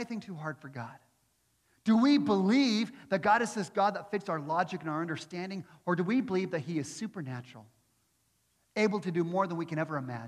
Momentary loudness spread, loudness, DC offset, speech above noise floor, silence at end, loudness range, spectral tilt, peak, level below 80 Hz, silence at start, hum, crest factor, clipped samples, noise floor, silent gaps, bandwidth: 14 LU; -31 LUFS; under 0.1%; 43 dB; 0 s; 7 LU; -6 dB/octave; -14 dBFS; -78 dBFS; 0 s; none; 18 dB; under 0.1%; -74 dBFS; none; 12 kHz